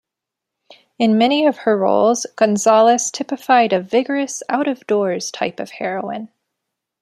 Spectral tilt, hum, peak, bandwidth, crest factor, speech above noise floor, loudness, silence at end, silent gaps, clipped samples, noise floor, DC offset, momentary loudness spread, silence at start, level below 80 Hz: -4 dB/octave; none; -2 dBFS; 13.5 kHz; 16 dB; 67 dB; -17 LUFS; 0.75 s; none; under 0.1%; -83 dBFS; under 0.1%; 11 LU; 1 s; -68 dBFS